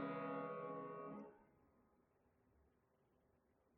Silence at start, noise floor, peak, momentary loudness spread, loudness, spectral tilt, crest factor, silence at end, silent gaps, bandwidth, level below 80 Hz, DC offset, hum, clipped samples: 0 s; -80 dBFS; -36 dBFS; 10 LU; -50 LUFS; -6 dB/octave; 18 dB; 2.35 s; none; 4.6 kHz; -86 dBFS; under 0.1%; none; under 0.1%